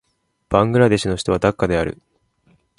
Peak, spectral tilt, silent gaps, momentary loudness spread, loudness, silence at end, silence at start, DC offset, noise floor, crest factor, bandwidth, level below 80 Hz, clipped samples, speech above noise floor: 0 dBFS; -6 dB/octave; none; 9 LU; -18 LUFS; 0.85 s; 0.5 s; under 0.1%; -60 dBFS; 20 dB; 11.5 kHz; -40 dBFS; under 0.1%; 42 dB